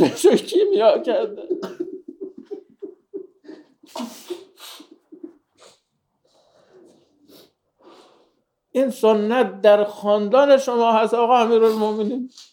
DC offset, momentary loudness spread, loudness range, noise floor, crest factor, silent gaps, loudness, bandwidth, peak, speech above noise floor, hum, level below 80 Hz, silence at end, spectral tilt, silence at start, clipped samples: under 0.1%; 22 LU; 22 LU; -70 dBFS; 18 dB; none; -18 LUFS; 19 kHz; -2 dBFS; 52 dB; none; -76 dBFS; 0.1 s; -5 dB/octave; 0 s; under 0.1%